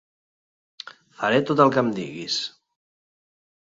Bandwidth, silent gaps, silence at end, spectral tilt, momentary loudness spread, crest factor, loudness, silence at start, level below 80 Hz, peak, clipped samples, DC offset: 7.8 kHz; none; 1.15 s; -5 dB/octave; 23 LU; 24 dB; -22 LUFS; 0.85 s; -68 dBFS; -2 dBFS; under 0.1%; under 0.1%